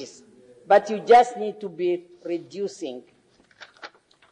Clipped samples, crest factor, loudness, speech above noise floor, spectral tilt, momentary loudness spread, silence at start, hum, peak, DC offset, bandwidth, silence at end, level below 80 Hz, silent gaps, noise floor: under 0.1%; 18 dB; -22 LUFS; 30 dB; -4.5 dB/octave; 26 LU; 0 s; none; -6 dBFS; under 0.1%; 10 kHz; 0.45 s; -68 dBFS; none; -52 dBFS